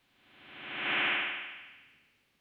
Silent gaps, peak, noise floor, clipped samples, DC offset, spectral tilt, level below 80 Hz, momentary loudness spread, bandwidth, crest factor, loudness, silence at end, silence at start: none; -18 dBFS; -68 dBFS; under 0.1%; under 0.1%; -4 dB/octave; -82 dBFS; 22 LU; 16.5 kHz; 18 dB; -32 LUFS; 0.6 s; 0.35 s